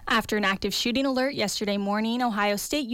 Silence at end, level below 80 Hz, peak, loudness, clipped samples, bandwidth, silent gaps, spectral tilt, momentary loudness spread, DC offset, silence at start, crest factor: 0 s; -52 dBFS; -14 dBFS; -25 LUFS; under 0.1%; 17 kHz; none; -3.5 dB/octave; 2 LU; under 0.1%; 0 s; 12 dB